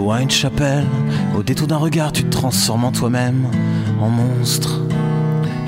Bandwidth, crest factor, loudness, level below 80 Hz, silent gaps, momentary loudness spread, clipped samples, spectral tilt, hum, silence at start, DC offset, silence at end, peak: 16.5 kHz; 14 dB; -17 LUFS; -42 dBFS; none; 3 LU; under 0.1%; -5 dB/octave; none; 0 s; under 0.1%; 0 s; -4 dBFS